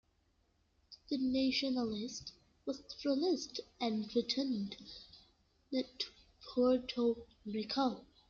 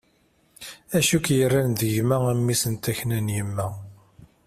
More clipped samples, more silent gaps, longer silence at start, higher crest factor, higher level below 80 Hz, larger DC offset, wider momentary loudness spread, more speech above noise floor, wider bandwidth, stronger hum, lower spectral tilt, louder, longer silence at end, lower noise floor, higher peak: neither; neither; first, 0.9 s vs 0.6 s; about the same, 16 dB vs 16 dB; second, -70 dBFS vs -54 dBFS; neither; second, 14 LU vs 17 LU; about the same, 39 dB vs 41 dB; second, 7.6 kHz vs 16 kHz; neither; about the same, -4.5 dB/octave vs -5 dB/octave; second, -37 LUFS vs -23 LUFS; about the same, 0.25 s vs 0.2 s; first, -75 dBFS vs -63 dBFS; second, -22 dBFS vs -8 dBFS